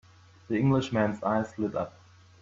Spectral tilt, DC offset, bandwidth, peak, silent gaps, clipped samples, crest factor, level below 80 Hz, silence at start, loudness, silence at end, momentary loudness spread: -7.5 dB/octave; under 0.1%; 7.6 kHz; -12 dBFS; none; under 0.1%; 16 dB; -60 dBFS; 0.5 s; -29 LUFS; 0.55 s; 8 LU